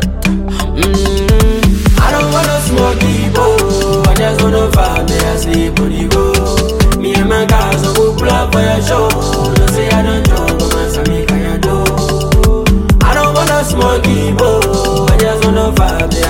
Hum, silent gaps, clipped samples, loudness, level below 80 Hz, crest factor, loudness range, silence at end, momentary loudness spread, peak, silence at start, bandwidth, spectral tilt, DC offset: none; none; under 0.1%; -11 LUFS; -16 dBFS; 10 dB; 1 LU; 0 s; 3 LU; 0 dBFS; 0 s; 17 kHz; -5.5 dB/octave; under 0.1%